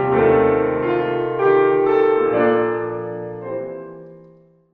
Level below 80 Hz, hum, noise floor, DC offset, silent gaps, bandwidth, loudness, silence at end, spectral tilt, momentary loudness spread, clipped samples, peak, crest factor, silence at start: -48 dBFS; none; -50 dBFS; under 0.1%; none; 4.4 kHz; -18 LUFS; 0.55 s; -9.5 dB/octave; 14 LU; under 0.1%; -4 dBFS; 14 dB; 0 s